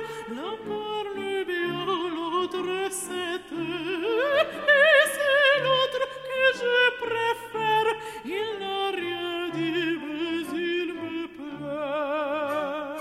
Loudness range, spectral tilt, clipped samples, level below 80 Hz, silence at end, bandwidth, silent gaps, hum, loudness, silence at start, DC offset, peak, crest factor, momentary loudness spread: 8 LU; -3 dB/octave; under 0.1%; -66 dBFS; 0 s; 15.5 kHz; none; none; -25 LUFS; 0 s; under 0.1%; -8 dBFS; 18 dB; 13 LU